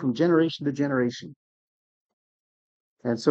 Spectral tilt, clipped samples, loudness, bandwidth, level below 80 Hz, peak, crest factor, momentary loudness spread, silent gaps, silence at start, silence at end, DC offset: -6.5 dB/octave; under 0.1%; -25 LUFS; 8.2 kHz; -72 dBFS; -6 dBFS; 20 dB; 11 LU; 1.36-2.97 s; 0 s; 0 s; under 0.1%